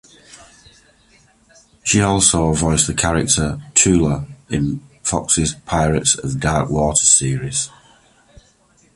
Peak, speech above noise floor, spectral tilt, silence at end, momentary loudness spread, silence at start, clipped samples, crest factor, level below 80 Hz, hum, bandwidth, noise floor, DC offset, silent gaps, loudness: 0 dBFS; 38 dB; -3.5 dB/octave; 1.3 s; 10 LU; 0.35 s; under 0.1%; 18 dB; -34 dBFS; none; 11.5 kHz; -55 dBFS; under 0.1%; none; -16 LUFS